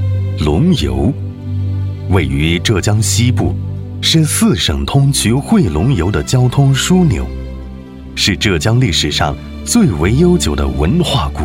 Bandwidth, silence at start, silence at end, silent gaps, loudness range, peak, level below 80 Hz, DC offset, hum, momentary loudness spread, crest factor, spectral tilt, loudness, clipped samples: 16.5 kHz; 0 s; 0 s; none; 2 LU; -2 dBFS; -26 dBFS; under 0.1%; none; 11 LU; 12 dB; -5 dB/octave; -13 LUFS; under 0.1%